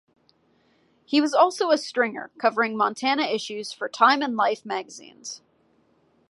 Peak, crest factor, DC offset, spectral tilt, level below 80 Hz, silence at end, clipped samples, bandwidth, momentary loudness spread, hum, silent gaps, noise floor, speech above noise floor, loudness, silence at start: -4 dBFS; 22 dB; under 0.1%; -3 dB/octave; -80 dBFS; 0.95 s; under 0.1%; 11.5 kHz; 18 LU; none; none; -64 dBFS; 41 dB; -23 LUFS; 1.1 s